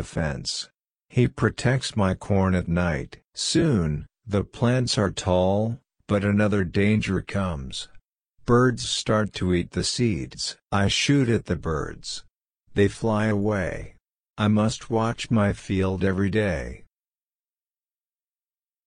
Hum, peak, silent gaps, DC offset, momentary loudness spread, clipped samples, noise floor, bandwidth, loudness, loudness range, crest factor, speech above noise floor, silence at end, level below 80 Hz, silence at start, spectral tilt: none; -6 dBFS; 14.30-14.34 s; under 0.1%; 10 LU; under 0.1%; under -90 dBFS; 10.5 kHz; -24 LUFS; 3 LU; 18 dB; over 67 dB; 2.1 s; -44 dBFS; 0 s; -5.5 dB/octave